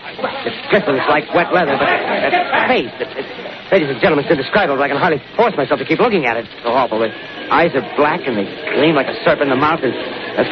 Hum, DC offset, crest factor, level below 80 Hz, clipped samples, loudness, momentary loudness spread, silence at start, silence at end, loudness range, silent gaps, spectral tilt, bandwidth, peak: none; under 0.1%; 16 dB; -52 dBFS; under 0.1%; -16 LUFS; 8 LU; 0 s; 0 s; 1 LU; none; -3 dB/octave; 6.2 kHz; 0 dBFS